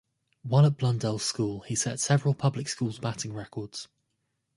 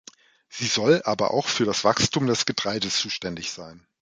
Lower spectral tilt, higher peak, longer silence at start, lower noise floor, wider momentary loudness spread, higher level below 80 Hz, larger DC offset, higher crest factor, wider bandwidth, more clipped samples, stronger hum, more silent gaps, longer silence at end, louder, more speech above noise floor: first, -5 dB/octave vs -3.5 dB/octave; second, -10 dBFS vs -4 dBFS; about the same, 0.45 s vs 0.5 s; first, -79 dBFS vs -51 dBFS; first, 15 LU vs 11 LU; second, -62 dBFS vs -56 dBFS; neither; about the same, 18 dB vs 20 dB; first, 11.5 kHz vs 9.6 kHz; neither; neither; neither; first, 0.7 s vs 0.25 s; second, -28 LUFS vs -23 LUFS; first, 51 dB vs 27 dB